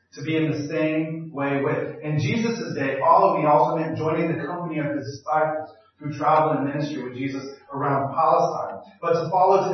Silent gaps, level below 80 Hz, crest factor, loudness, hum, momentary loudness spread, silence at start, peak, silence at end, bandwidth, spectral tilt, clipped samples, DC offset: none; -70 dBFS; 18 dB; -23 LUFS; none; 12 LU; 0.15 s; -4 dBFS; 0 s; 6.4 kHz; -7 dB/octave; under 0.1%; under 0.1%